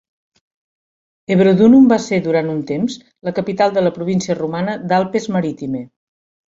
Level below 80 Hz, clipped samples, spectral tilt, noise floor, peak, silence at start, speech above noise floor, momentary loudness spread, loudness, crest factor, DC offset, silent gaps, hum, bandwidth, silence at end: -56 dBFS; under 0.1%; -7 dB/octave; under -90 dBFS; -2 dBFS; 1.3 s; over 75 dB; 14 LU; -16 LUFS; 16 dB; under 0.1%; none; none; 7.8 kHz; 0.7 s